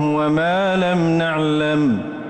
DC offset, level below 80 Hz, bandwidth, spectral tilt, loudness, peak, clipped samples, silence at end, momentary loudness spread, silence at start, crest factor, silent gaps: under 0.1%; -52 dBFS; 8.8 kHz; -7 dB/octave; -18 LUFS; -10 dBFS; under 0.1%; 0 s; 1 LU; 0 s; 8 dB; none